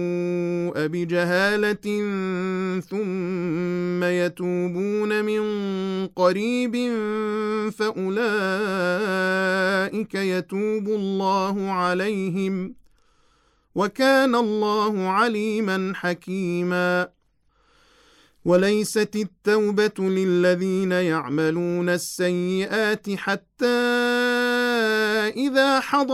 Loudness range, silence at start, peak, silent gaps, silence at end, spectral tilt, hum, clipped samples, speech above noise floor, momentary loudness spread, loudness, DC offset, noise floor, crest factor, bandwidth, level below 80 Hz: 3 LU; 0 s; -6 dBFS; none; 0 s; -5.5 dB/octave; none; under 0.1%; 42 dB; 6 LU; -23 LUFS; under 0.1%; -64 dBFS; 18 dB; 14.5 kHz; -66 dBFS